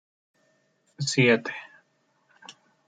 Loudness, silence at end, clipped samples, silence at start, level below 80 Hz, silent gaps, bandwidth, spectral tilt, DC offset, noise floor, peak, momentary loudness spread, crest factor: -24 LUFS; 0.35 s; under 0.1%; 1 s; -76 dBFS; none; 9.6 kHz; -4.5 dB/octave; under 0.1%; -69 dBFS; -8 dBFS; 20 LU; 22 dB